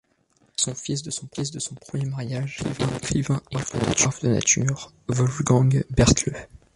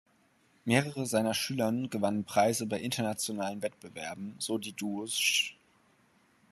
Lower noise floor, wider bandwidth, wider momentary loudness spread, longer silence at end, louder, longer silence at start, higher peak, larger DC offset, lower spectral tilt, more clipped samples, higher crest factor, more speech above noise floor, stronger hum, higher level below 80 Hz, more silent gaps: second, -64 dBFS vs -68 dBFS; second, 11.5 kHz vs 13 kHz; about the same, 11 LU vs 11 LU; second, 0.3 s vs 1 s; first, -23 LUFS vs -31 LUFS; about the same, 0.6 s vs 0.65 s; first, -4 dBFS vs -8 dBFS; neither; about the same, -4.5 dB/octave vs -3.5 dB/octave; neither; about the same, 20 dB vs 24 dB; first, 40 dB vs 36 dB; neither; first, -40 dBFS vs -74 dBFS; neither